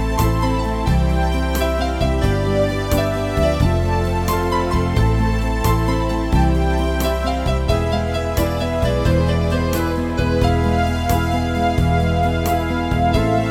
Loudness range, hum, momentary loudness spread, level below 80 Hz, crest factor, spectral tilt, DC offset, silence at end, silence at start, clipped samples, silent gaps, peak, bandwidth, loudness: 1 LU; none; 3 LU; -22 dBFS; 14 dB; -6.5 dB/octave; under 0.1%; 0 s; 0 s; under 0.1%; none; -2 dBFS; 17.5 kHz; -19 LUFS